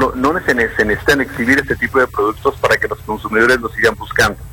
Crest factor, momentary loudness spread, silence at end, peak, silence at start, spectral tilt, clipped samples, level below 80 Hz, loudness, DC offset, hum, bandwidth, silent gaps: 16 dB; 4 LU; 0 s; 0 dBFS; 0 s; -4.5 dB/octave; under 0.1%; -36 dBFS; -15 LUFS; under 0.1%; none; 18.5 kHz; none